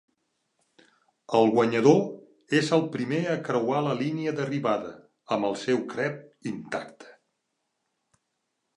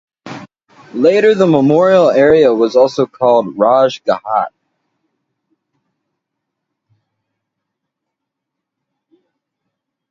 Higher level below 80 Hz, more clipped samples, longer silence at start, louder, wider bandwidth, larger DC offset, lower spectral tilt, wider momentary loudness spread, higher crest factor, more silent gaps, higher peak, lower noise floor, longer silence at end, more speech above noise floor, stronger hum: second, -74 dBFS vs -56 dBFS; neither; first, 1.3 s vs 0.25 s; second, -26 LUFS vs -11 LUFS; first, 11 kHz vs 7.6 kHz; neither; about the same, -6 dB/octave vs -6.5 dB/octave; second, 15 LU vs 18 LU; first, 22 dB vs 14 dB; neither; second, -6 dBFS vs 0 dBFS; about the same, -79 dBFS vs -78 dBFS; second, 1.65 s vs 5.65 s; second, 54 dB vs 68 dB; neither